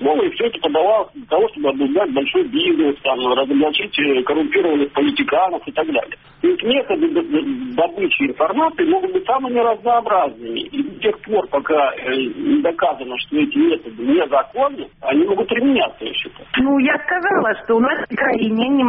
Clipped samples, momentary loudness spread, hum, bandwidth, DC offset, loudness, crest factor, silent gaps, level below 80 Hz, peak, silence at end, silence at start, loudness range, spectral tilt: under 0.1%; 5 LU; none; 4.8 kHz; under 0.1%; -18 LUFS; 14 dB; none; -54 dBFS; -4 dBFS; 0 s; 0 s; 2 LU; -2 dB/octave